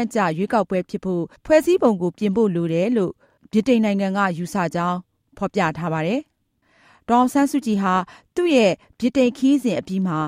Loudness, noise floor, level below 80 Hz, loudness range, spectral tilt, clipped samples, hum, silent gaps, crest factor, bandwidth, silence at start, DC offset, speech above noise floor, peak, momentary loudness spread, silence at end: -21 LUFS; -64 dBFS; -56 dBFS; 3 LU; -6.5 dB/octave; under 0.1%; none; none; 18 dB; 16 kHz; 0 s; under 0.1%; 44 dB; -2 dBFS; 8 LU; 0 s